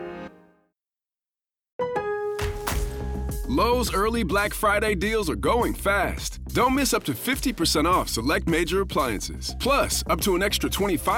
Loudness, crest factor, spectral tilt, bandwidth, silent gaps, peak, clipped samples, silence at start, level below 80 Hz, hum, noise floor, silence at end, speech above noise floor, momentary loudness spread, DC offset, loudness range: -24 LUFS; 14 dB; -4 dB/octave; 19.5 kHz; 1.72-1.79 s; -12 dBFS; under 0.1%; 0 s; -36 dBFS; none; under -90 dBFS; 0 s; over 67 dB; 9 LU; under 0.1%; 5 LU